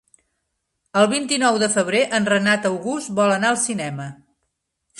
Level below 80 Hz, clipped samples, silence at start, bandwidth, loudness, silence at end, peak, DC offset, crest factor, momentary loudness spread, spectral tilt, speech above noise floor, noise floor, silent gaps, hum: -64 dBFS; under 0.1%; 0.95 s; 11.5 kHz; -19 LUFS; 0.85 s; -2 dBFS; under 0.1%; 18 dB; 9 LU; -3.5 dB/octave; 56 dB; -75 dBFS; none; none